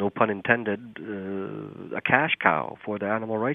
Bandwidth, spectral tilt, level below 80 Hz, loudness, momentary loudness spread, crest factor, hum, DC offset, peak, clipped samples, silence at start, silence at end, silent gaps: 3.9 kHz; -9 dB/octave; -70 dBFS; -26 LUFS; 13 LU; 26 dB; none; under 0.1%; 0 dBFS; under 0.1%; 0 s; 0 s; none